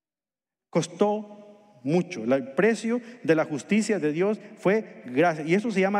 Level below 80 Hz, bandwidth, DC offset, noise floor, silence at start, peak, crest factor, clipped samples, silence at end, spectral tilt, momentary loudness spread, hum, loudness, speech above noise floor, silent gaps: -82 dBFS; 11.5 kHz; under 0.1%; under -90 dBFS; 0.75 s; -10 dBFS; 16 dB; under 0.1%; 0 s; -6 dB/octave; 6 LU; none; -26 LUFS; over 65 dB; none